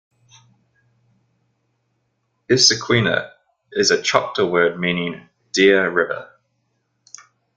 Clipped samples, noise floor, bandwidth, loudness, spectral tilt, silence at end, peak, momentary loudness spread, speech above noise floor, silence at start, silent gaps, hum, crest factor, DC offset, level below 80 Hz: under 0.1%; -70 dBFS; 9.4 kHz; -17 LUFS; -3 dB/octave; 1.35 s; 0 dBFS; 15 LU; 53 dB; 2.5 s; none; none; 20 dB; under 0.1%; -58 dBFS